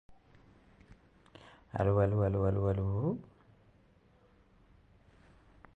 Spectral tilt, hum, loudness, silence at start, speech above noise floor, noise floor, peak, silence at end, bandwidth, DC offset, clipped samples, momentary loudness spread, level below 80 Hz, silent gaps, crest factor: -10.5 dB/octave; none; -32 LUFS; 0.1 s; 35 dB; -65 dBFS; -16 dBFS; 2.55 s; 4 kHz; under 0.1%; under 0.1%; 14 LU; -52 dBFS; none; 20 dB